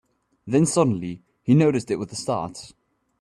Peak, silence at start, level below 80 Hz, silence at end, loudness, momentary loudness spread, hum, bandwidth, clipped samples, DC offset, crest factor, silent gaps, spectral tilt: -6 dBFS; 0.45 s; -60 dBFS; 0.55 s; -22 LUFS; 15 LU; none; 12.5 kHz; under 0.1%; under 0.1%; 16 dB; none; -6.5 dB/octave